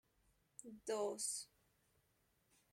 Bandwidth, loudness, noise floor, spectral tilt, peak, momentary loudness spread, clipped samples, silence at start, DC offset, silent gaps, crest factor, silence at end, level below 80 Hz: 16.5 kHz; -44 LUFS; -80 dBFS; -1.5 dB/octave; -30 dBFS; 18 LU; under 0.1%; 0.65 s; under 0.1%; none; 18 dB; 1.3 s; -84 dBFS